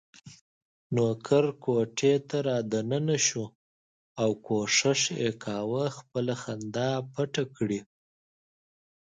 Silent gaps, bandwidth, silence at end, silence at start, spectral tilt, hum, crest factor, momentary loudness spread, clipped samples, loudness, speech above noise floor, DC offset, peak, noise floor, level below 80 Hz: 0.41-0.90 s, 3.55-4.15 s; 9.6 kHz; 1.2 s; 0.25 s; -4 dB/octave; none; 20 dB; 8 LU; under 0.1%; -28 LUFS; over 62 dB; under 0.1%; -10 dBFS; under -90 dBFS; -70 dBFS